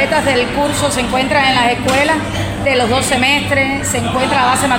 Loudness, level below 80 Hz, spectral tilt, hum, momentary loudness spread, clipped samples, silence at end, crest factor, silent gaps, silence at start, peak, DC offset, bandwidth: -13 LUFS; -34 dBFS; -3.5 dB/octave; none; 4 LU; under 0.1%; 0 s; 14 dB; none; 0 s; 0 dBFS; under 0.1%; 16.5 kHz